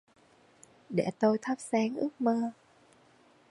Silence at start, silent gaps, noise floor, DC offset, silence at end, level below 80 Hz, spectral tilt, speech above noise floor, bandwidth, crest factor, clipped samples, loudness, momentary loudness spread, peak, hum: 0.9 s; none; -62 dBFS; under 0.1%; 1 s; -76 dBFS; -6.5 dB/octave; 33 dB; 11.5 kHz; 20 dB; under 0.1%; -31 LUFS; 5 LU; -14 dBFS; none